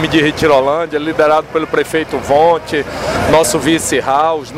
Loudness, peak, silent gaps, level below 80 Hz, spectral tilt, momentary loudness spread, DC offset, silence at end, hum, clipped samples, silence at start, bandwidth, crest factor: -13 LUFS; -2 dBFS; none; -38 dBFS; -4 dB/octave; 6 LU; under 0.1%; 0 s; none; under 0.1%; 0 s; 16 kHz; 12 dB